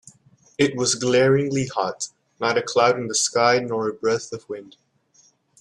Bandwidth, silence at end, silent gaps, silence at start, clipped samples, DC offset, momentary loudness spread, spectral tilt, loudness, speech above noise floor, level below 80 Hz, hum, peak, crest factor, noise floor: 12 kHz; 0.95 s; none; 0.6 s; under 0.1%; under 0.1%; 15 LU; -3.5 dB/octave; -21 LUFS; 38 dB; -62 dBFS; none; -2 dBFS; 20 dB; -59 dBFS